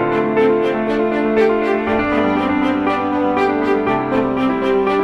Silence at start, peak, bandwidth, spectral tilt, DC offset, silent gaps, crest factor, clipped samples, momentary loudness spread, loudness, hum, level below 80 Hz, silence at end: 0 s; -4 dBFS; 9.4 kHz; -7 dB/octave; under 0.1%; none; 12 dB; under 0.1%; 3 LU; -16 LUFS; none; -42 dBFS; 0 s